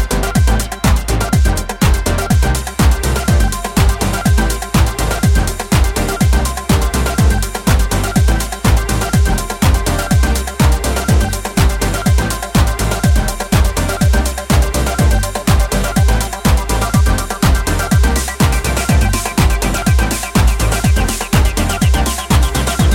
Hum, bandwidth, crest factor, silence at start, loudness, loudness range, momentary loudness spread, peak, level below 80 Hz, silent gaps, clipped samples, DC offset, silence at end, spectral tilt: none; 17 kHz; 12 dB; 0 s; -14 LUFS; 1 LU; 2 LU; 0 dBFS; -16 dBFS; none; under 0.1%; under 0.1%; 0 s; -5 dB/octave